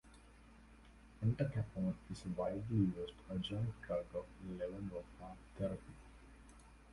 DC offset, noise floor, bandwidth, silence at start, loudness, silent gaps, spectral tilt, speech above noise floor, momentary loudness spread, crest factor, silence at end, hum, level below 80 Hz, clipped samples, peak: under 0.1%; -62 dBFS; 11.5 kHz; 0.05 s; -42 LUFS; none; -8 dB/octave; 20 dB; 25 LU; 20 dB; 0 s; none; -60 dBFS; under 0.1%; -24 dBFS